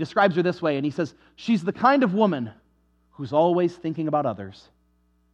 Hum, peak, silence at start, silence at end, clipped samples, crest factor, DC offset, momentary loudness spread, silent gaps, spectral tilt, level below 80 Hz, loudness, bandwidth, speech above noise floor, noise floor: none; -4 dBFS; 0 s; 0.8 s; under 0.1%; 20 dB; under 0.1%; 15 LU; none; -7.5 dB/octave; -66 dBFS; -23 LUFS; 9 kHz; 42 dB; -65 dBFS